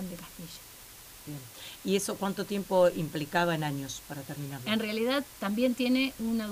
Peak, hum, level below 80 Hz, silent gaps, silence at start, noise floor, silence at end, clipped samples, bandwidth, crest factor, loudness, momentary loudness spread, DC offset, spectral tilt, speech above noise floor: -14 dBFS; none; -60 dBFS; none; 0 s; -50 dBFS; 0 s; under 0.1%; 16 kHz; 18 dB; -30 LUFS; 17 LU; under 0.1%; -4.5 dB/octave; 20 dB